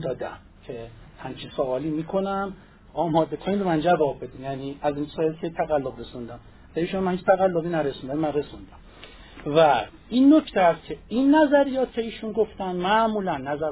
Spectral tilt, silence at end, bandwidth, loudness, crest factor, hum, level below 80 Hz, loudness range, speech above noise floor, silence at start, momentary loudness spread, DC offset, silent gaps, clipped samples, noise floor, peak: -10.5 dB/octave; 0 s; 4 kHz; -24 LUFS; 18 dB; none; -52 dBFS; 7 LU; 22 dB; 0 s; 18 LU; under 0.1%; none; under 0.1%; -46 dBFS; -6 dBFS